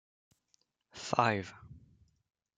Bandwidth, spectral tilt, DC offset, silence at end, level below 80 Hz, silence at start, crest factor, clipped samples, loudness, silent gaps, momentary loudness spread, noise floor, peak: 9.6 kHz; -5 dB/octave; under 0.1%; 0.8 s; -72 dBFS; 0.95 s; 26 dB; under 0.1%; -32 LUFS; none; 24 LU; -76 dBFS; -12 dBFS